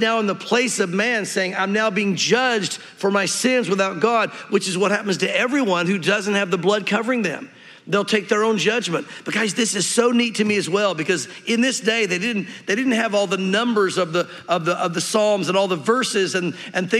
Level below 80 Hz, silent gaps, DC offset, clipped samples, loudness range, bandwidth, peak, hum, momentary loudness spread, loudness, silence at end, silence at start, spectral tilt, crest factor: -78 dBFS; none; under 0.1%; under 0.1%; 1 LU; 14 kHz; -2 dBFS; none; 5 LU; -20 LUFS; 0 s; 0 s; -3.5 dB/octave; 18 dB